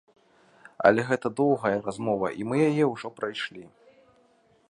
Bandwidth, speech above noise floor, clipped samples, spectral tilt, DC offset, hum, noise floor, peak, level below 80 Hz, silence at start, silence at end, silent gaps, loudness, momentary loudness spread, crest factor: 11 kHz; 37 dB; under 0.1%; -6.5 dB/octave; under 0.1%; none; -63 dBFS; -4 dBFS; -66 dBFS; 0.8 s; 1.05 s; none; -26 LUFS; 11 LU; 24 dB